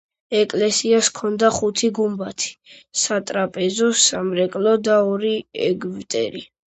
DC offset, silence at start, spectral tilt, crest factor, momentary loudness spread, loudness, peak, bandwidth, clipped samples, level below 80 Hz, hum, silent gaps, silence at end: under 0.1%; 0.3 s; -3 dB/octave; 18 dB; 9 LU; -20 LUFS; -2 dBFS; 9 kHz; under 0.1%; -60 dBFS; none; none; 0.25 s